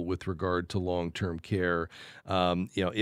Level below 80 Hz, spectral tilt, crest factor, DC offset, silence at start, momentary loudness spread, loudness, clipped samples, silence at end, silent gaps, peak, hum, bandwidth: -54 dBFS; -6.5 dB/octave; 18 dB; under 0.1%; 0 s; 6 LU; -31 LUFS; under 0.1%; 0 s; none; -12 dBFS; none; 12 kHz